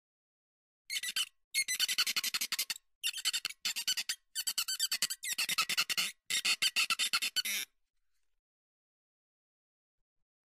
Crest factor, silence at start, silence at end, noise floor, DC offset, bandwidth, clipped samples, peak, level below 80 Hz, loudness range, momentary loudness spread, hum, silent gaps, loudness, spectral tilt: 20 dB; 0.9 s; 2.85 s; under -90 dBFS; under 0.1%; 16 kHz; under 0.1%; -16 dBFS; -86 dBFS; 4 LU; 7 LU; none; 1.44-1.51 s, 2.95-3.01 s; -32 LUFS; 3 dB/octave